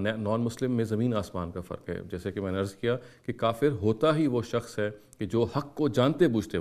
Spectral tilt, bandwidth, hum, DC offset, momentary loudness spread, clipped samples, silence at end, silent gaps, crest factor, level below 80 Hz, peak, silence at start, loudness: -7 dB/octave; 14.5 kHz; none; under 0.1%; 12 LU; under 0.1%; 0 s; none; 18 dB; -60 dBFS; -10 dBFS; 0 s; -29 LUFS